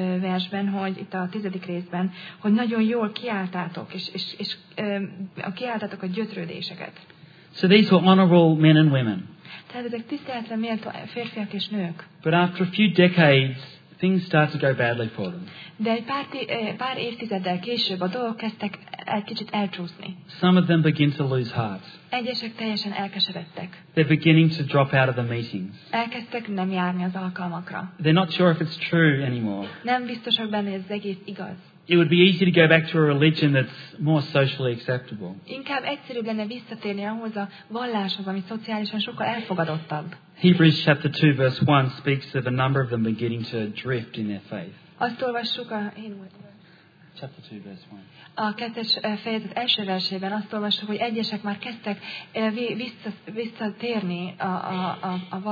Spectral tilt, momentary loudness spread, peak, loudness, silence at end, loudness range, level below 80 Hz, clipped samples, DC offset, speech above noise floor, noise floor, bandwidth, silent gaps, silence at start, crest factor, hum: -8 dB/octave; 16 LU; -2 dBFS; -24 LUFS; 0 s; 10 LU; -70 dBFS; under 0.1%; under 0.1%; 29 dB; -53 dBFS; 5 kHz; none; 0 s; 22 dB; none